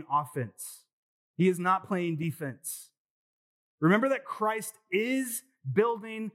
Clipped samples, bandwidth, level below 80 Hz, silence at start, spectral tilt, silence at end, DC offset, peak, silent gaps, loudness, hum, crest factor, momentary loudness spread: under 0.1%; 16.5 kHz; under -90 dBFS; 0 s; -5.5 dB/octave; 0.05 s; under 0.1%; -10 dBFS; 0.93-1.34 s, 3.00-3.78 s; -30 LUFS; none; 20 dB; 13 LU